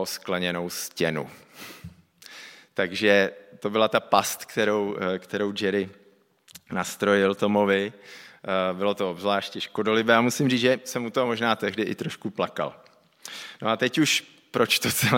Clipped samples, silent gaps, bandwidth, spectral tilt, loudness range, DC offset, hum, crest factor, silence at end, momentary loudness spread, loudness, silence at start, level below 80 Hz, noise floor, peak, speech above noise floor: under 0.1%; none; 17 kHz; -4 dB/octave; 3 LU; under 0.1%; none; 24 dB; 0 s; 18 LU; -25 LUFS; 0 s; -68 dBFS; -58 dBFS; -2 dBFS; 33 dB